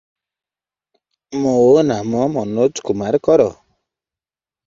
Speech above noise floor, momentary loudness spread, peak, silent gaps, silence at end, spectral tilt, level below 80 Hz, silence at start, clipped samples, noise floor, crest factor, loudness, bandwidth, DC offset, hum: over 75 dB; 9 LU; -2 dBFS; none; 1.15 s; -6.5 dB/octave; -54 dBFS; 1.3 s; under 0.1%; under -90 dBFS; 16 dB; -16 LUFS; 7.8 kHz; under 0.1%; none